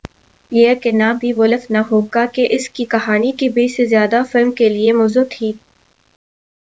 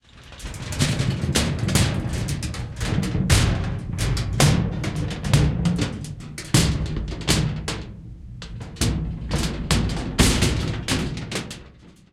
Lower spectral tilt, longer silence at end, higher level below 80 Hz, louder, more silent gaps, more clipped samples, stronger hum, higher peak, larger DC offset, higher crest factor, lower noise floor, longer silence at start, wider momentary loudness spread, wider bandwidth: about the same, -5.5 dB/octave vs -4.5 dB/octave; first, 1.2 s vs 0.2 s; second, -56 dBFS vs -32 dBFS; first, -15 LUFS vs -23 LUFS; neither; neither; neither; about the same, 0 dBFS vs -2 dBFS; first, 0.2% vs under 0.1%; second, 16 dB vs 22 dB; second, -38 dBFS vs -47 dBFS; first, 0.5 s vs 0.15 s; second, 6 LU vs 15 LU; second, 8 kHz vs 16.5 kHz